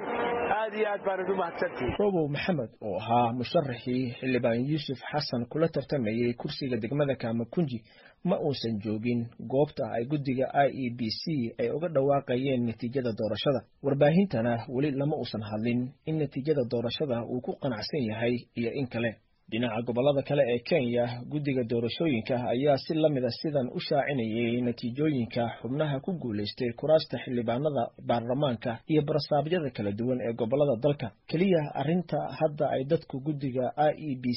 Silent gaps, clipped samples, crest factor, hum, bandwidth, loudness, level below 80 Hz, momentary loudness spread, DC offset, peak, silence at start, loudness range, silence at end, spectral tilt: none; under 0.1%; 18 dB; none; 5.8 kHz; -29 LUFS; -60 dBFS; 6 LU; under 0.1%; -10 dBFS; 0 s; 3 LU; 0 s; -5.5 dB/octave